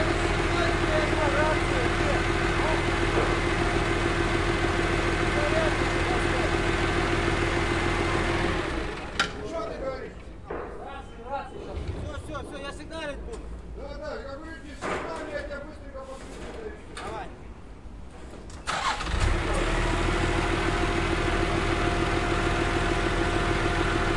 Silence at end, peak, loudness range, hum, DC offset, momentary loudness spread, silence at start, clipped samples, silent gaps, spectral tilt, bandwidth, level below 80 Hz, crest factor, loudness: 0 s; -10 dBFS; 12 LU; none; 0.3%; 15 LU; 0 s; under 0.1%; none; -5 dB/octave; 11.5 kHz; -34 dBFS; 16 dB; -27 LUFS